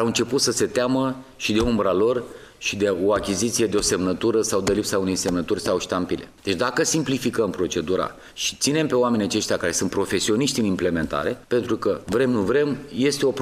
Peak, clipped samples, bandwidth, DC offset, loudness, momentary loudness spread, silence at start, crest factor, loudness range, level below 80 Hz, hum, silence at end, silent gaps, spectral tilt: -6 dBFS; under 0.1%; 15.5 kHz; under 0.1%; -22 LUFS; 5 LU; 0 s; 16 dB; 1 LU; -46 dBFS; none; 0 s; none; -4 dB/octave